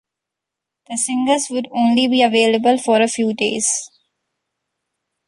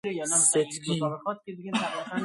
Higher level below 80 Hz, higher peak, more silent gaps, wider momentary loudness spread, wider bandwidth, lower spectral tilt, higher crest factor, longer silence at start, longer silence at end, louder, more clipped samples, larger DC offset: first, -66 dBFS vs -72 dBFS; first, -2 dBFS vs -10 dBFS; neither; second, 8 LU vs 14 LU; about the same, 11.5 kHz vs 12 kHz; about the same, -2.5 dB/octave vs -3 dB/octave; about the same, 16 dB vs 18 dB; first, 0.9 s vs 0.05 s; first, 1.4 s vs 0 s; first, -17 LUFS vs -26 LUFS; neither; neither